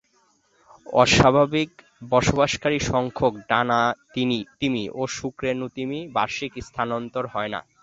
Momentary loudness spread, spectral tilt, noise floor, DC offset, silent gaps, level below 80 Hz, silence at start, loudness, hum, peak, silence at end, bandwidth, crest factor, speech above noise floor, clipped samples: 11 LU; -4.5 dB/octave; -64 dBFS; under 0.1%; none; -46 dBFS; 0.85 s; -23 LUFS; none; -2 dBFS; 0.2 s; 8 kHz; 22 dB; 41 dB; under 0.1%